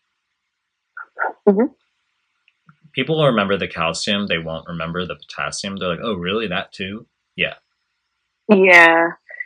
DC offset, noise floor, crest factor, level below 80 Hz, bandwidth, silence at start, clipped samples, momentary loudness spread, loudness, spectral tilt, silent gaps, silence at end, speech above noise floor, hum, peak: under 0.1%; -76 dBFS; 20 dB; -58 dBFS; 10.5 kHz; 0.95 s; under 0.1%; 18 LU; -17 LUFS; -4.5 dB/octave; none; 0 s; 58 dB; none; 0 dBFS